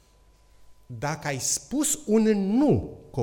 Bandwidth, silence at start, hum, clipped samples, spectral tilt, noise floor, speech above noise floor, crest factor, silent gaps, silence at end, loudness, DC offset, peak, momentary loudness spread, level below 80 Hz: 17.5 kHz; 0.7 s; none; under 0.1%; -4.5 dB/octave; -58 dBFS; 33 dB; 16 dB; none; 0 s; -25 LUFS; under 0.1%; -10 dBFS; 11 LU; -52 dBFS